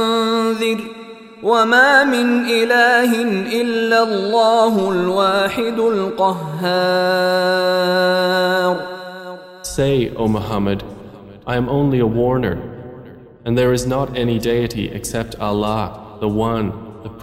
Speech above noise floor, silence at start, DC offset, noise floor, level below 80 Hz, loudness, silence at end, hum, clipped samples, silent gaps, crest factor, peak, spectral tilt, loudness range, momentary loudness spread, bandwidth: 22 dB; 0 s; under 0.1%; -39 dBFS; -42 dBFS; -17 LUFS; 0 s; none; under 0.1%; none; 16 dB; 0 dBFS; -5 dB/octave; 6 LU; 17 LU; 16 kHz